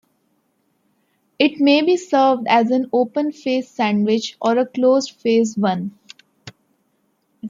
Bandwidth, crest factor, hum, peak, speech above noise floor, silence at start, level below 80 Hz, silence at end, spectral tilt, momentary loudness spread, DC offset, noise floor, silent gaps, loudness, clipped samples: 7.6 kHz; 18 dB; none; -2 dBFS; 49 dB; 1.4 s; -70 dBFS; 0 s; -5 dB/octave; 7 LU; under 0.1%; -66 dBFS; none; -18 LUFS; under 0.1%